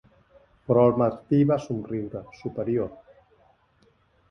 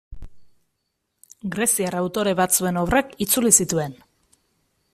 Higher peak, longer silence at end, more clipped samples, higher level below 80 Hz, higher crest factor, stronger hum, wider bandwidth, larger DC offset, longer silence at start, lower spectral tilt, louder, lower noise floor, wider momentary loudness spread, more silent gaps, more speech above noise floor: second, -6 dBFS vs 0 dBFS; first, 1.35 s vs 1 s; neither; second, -58 dBFS vs -44 dBFS; about the same, 20 dB vs 24 dB; neither; second, 6.8 kHz vs 15.5 kHz; neither; first, 0.7 s vs 0.1 s; first, -9.5 dB/octave vs -3.5 dB/octave; second, -25 LUFS vs -20 LUFS; second, -63 dBFS vs -76 dBFS; first, 15 LU vs 12 LU; neither; second, 39 dB vs 55 dB